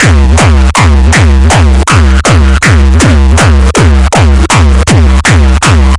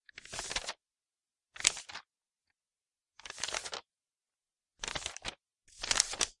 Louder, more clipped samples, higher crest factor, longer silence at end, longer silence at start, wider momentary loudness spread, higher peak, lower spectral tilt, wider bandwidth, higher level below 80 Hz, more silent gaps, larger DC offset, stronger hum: first, -5 LUFS vs -35 LUFS; first, 0.9% vs under 0.1%; second, 4 dB vs 38 dB; about the same, 0 s vs 0.1 s; second, 0 s vs 0.15 s; second, 1 LU vs 18 LU; about the same, 0 dBFS vs -2 dBFS; first, -5 dB/octave vs 1 dB/octave; about the same, 11.5 kHz vs 11.5 kHz; first, -6 dBFS vs -62 dBFS; neither; neither; neither